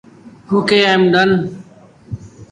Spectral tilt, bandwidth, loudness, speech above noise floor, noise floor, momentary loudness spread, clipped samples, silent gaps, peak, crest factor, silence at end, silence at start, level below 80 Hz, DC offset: -6 dB/octave; 11 kHz; -13 LUFS; 30 dB; -43 dBFS; 20 LU; under 0.1%; none; 0 dBFS; 16 dB; 0.05 s; 0.25 s; -48 dBFS; under 0.1%